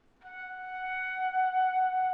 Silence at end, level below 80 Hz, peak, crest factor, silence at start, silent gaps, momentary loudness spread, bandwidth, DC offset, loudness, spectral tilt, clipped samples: 0 s; -68 dBFS; -20 dBFS; 10 dB; 0.25 s; none; 15 LU; 4.7 kHz; under 0.1%; -30 LUFS; -3 dB/octave; under 0.1%